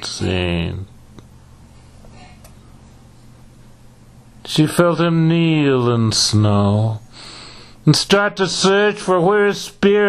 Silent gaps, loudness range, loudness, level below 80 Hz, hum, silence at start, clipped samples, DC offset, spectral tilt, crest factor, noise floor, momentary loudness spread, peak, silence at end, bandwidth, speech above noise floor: none; 11 LU; -16 LUFS; -44 dBFS; none; 0 s; under 0.1%; under 0.1%; -5 dB/octave; 18 dB; -44 dBFS; 20 LU; 0 dBFS; 0 s; 13.5 kHz; 29 dB